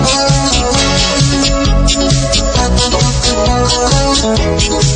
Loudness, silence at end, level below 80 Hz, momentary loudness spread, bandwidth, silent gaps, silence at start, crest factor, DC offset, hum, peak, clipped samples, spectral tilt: -11 LUFS; 0 s; -18 dBFS; 2 LU; 9.6 kHz; none; 0 s; 10 dB; under 0.1%; none; 0 dBFS; under 0.1%; -4 dB/octave